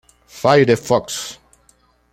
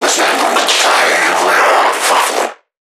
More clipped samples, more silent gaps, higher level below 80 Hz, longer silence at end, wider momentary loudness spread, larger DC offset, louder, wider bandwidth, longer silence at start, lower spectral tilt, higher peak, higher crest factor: neither; neither; first, -54 dBFS vs -70 dBFS; first, 0.8 s vs 0.4 s; first, 13 LU vs 5 LU; neither; second, -16 LUFS vs -10 LUFS; second, 16 kHz vs 19.5 kHz; first, 0.35 s vs 0 s; first, -5 dB/octave vs 0.5 dB/octave; about the same, -2 dBFS vs 0 dBFS; first, 18 dB vs 12 dB